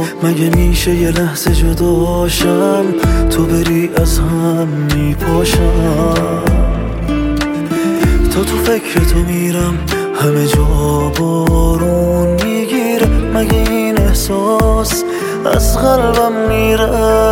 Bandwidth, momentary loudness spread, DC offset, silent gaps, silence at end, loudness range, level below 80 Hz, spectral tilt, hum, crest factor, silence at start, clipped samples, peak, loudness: 17 kHz; 4 LU; under 0.1%; none; 0 s; 2 LU; -18 dBFS; -5.5 dB/octave; none; 12 dB; 0 s; under 0.1%; 0 dBFS; -13 LUFS